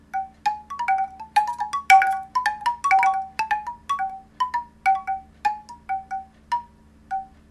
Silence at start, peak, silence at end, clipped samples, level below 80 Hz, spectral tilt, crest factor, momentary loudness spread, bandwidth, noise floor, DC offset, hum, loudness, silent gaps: 0.15 s; 0 dBFS; 0.25 s; under 0.1%; -56 dBFS; -1 dB/octave; 24 dB; 14 LU; 13.5 kHz; -50 dBFS; under 0.1%; none; -24 LUFS; none